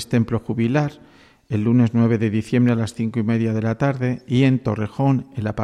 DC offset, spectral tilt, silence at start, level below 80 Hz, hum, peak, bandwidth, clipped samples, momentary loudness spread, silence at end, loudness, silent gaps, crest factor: under 0.1%; -8 dB/octave; 0 s; -52 dBFS; none; -6 dBFS; 12 kHz; under 0.1%; 6 LU; 0 s; -20 LUFS; none; 14 dB